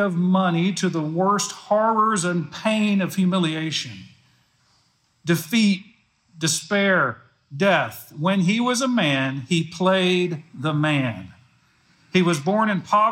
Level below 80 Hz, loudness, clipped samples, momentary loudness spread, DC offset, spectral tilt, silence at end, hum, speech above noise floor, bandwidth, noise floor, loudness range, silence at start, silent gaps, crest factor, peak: -72 dBFS; -21 LUFS; under 0.1%; 8 LU; under 0.1%; -5 dB/octave; 0 s; none; 43 dB; 16.5 kHz; -64 dBFS; 3 LU; 0 s; none; 16 dB; -6 dBFS